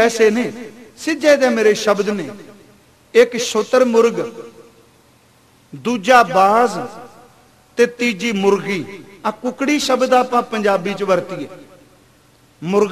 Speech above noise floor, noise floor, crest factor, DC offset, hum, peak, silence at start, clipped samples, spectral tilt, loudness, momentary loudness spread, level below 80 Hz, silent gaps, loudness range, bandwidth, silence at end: 36 dB; -52 dBFS; 18 dB; 0.1%; none; 0 dBFS; 0 s; under 0.1%; -4 dB/octave; -16 LUFS; 16 LU; -60 dBFS; none; 3 LU; 15 kHz; 0 s